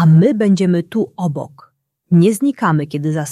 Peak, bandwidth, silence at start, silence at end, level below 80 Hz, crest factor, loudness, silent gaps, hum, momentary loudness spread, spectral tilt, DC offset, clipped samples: -2 dBFS; 12.5 kHz; 0 s; 0 s; -58 dBFS; 12 dB; -15 LUFS; none; none; 10 LU; -7.5 dB/octave; under 0.1%; under 0.1%